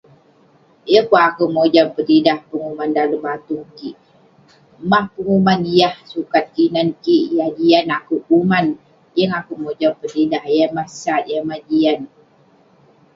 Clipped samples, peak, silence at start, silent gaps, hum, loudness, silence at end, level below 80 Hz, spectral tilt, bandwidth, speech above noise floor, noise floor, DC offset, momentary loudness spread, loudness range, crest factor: under 0.1%; 0 dBFS; 0.85 s; none; none; -17 LUFS; 1.1 s; -58 dBFS; -6.5 dB/octave; 7.6 kHz; 36 dB; -52 dBFS; under 0.1%; 12 LU; 4 LU; 18 dB